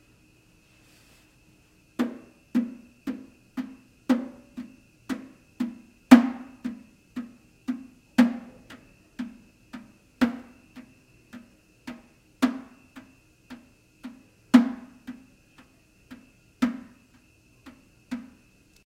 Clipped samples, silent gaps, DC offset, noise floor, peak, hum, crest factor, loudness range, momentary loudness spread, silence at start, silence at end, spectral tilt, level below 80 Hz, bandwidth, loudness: under 0.1%; none; under 0.1%; -59 dBFS; 0 dBFS; none; 30 dB; 12 LU; 28 LU; 2 s; 0.75 s; -5.5 dB/octave; -64 dBFS; 15 kHz; -27 LUFS